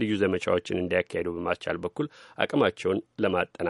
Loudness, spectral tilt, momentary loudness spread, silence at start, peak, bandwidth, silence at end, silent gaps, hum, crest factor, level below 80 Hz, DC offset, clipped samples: -28 LUFS; -6 dB/octave; 7 LU; 0 s; -6 dBFS; 11.5 kHz; 0 s; none; none; 22 dB; -60 dBFS; under 0.1%; under 0.1%